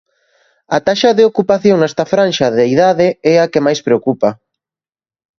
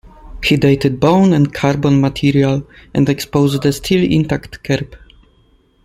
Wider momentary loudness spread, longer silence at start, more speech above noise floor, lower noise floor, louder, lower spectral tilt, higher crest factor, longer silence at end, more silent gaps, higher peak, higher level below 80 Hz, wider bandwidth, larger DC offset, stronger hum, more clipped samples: second, 5 LU vs 8 LU; first, 0.7 s vs 0.25 s; first, over 78 dB vs 39 dB; first, under -90 dBFS vs -53 dBFS; first, -12 LUFS vs -15 LUFS; about the same, -5.5 dB/octave vs -6.5 dB/octave; about the same, 14 dB vs 14 dB; first, 1.05 s vs 0.9 s; neither; about the same, 0 dBFS vs 0 dBFS; second, -56 dBFS vs -38 dBFS; second, 7.4 kHz vs 15.5 kHz; neither; neither; neither